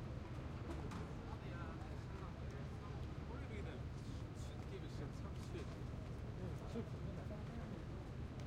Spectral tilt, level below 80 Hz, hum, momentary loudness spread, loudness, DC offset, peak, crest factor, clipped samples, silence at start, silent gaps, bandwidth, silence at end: -7 dB/octave; -54 dBFS; none; 2 LU; -49 LUFS; under 0.1%; -34 dBFS; 14 dB; under 0.1%; 0 s; none; 13.5 kHz; 0 s